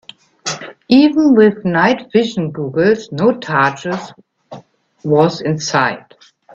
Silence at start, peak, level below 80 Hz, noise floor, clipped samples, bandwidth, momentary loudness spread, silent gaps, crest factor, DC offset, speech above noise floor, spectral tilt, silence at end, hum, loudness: 0.45 s; 0 dBFS; -56 dBFS; -37 dBFS; under 0.1%; 7.8 kHz; 15 LU; none; 16 dB; under 0.1%; 24 dB; -5.5 dB/octave; 0.55 s; none; -14 LUFS